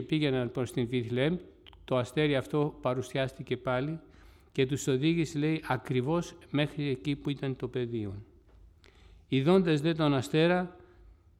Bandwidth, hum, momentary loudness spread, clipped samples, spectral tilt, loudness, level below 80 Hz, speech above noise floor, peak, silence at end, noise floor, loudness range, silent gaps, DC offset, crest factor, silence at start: 14.5 kHz; none; 9 LU; under 0.1%; -6.5 dB/octave; -30 LUFS; -58 dBFS; 28 dB; -12 dBFS; 0.65 s; -57 dBFS; 4 LU; none; under 0.1%; 18 dB; 0 s